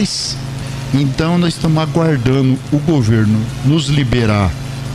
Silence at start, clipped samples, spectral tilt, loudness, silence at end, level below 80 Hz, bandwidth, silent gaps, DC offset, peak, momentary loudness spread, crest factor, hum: 0 s; under 0.1%; -6 dB/octave; -15 LUFS; 0 s; -34 dBFS; 13.5 kHz; none; under 0.1%; -2 dBFS; 6 LU; 12 dB; none